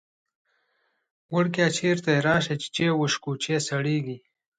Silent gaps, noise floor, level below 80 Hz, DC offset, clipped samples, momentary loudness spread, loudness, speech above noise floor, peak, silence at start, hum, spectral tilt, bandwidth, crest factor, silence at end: none; -72 dBFS; -64 dBFS; under 0.1%; under 0.1%; 7 LU; -25 LUFS; 48 dB; -8 dBFS; 1.3 s; none; -5 dB/octave; 9.4 kHz; 18 dB; 0.4 s